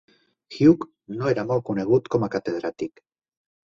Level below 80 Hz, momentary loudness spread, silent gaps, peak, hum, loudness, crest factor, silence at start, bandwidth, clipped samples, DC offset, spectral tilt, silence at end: -58 dBFS; 16 LU; none; -4 dBFS; none; -23 LUFS; 20 dB; 0.5 s; 7.4 kHz; under 0.1%; under 0.1%; -8 dB/octave; 0.8 s